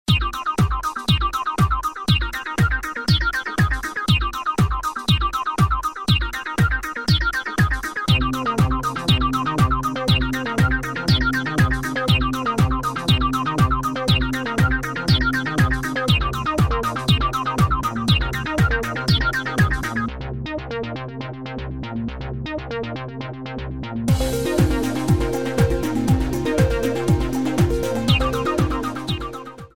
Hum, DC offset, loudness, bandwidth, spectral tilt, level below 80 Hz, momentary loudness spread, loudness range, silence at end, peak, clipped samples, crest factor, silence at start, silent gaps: none; under 0.1%; -21 LUFS; 17 kHz; -5.5 dB/octave; -30 dBFS; 9 LU; 4 LU; 0.1 s; -4 dBFS; under 0.1%; 18 dB; 0.05 s; none